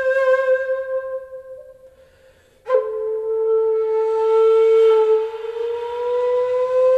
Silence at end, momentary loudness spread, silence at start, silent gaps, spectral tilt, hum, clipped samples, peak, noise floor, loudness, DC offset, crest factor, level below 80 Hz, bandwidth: 0 s; 13 LU; 0 s; none; -3 dB/octave; none; under 0.1%; -6 dBFS; -52 dBFS; -18 LUFS; under 0.1%; 14 dB; -62 dBFS; 7.6 kHz